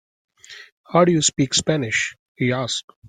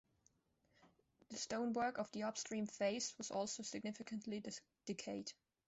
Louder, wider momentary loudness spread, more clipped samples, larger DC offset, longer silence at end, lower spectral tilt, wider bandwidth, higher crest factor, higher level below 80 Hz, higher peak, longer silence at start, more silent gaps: first, -20 LUFS vs -45 LUFS; first, 20 LU vs 9 LU; neither; neither; second, 0 s vs 0.35 s; about the same, -3.5 dB/octave vs -3.5 dB/octave; first, 9.8 kHz vs 8.2 kHz; about the same, 20 dB vs 18 dB; first, -56 dBFS vs -82 dBFS; first, -2 dBFS vs -28 dBFS; second, 0.5 s vs 0.85 s; first, 0.72-0.84 s, 2.19-2.35 s, 2.84-2.88 s, 2.96-3.02 s vs none